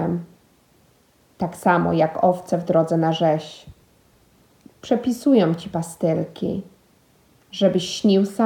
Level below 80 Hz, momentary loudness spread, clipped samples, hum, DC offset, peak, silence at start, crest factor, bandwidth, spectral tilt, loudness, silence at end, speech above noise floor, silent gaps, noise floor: -58 dBFS; 12 LU; under 0.1%; none; under 0.1%; -4 dBFS; 0 s; 18 dB; 17.5 kHz; -6.5 dB/octave; -21 LUFS; 0 s; 38 dB; none; -58 dBFS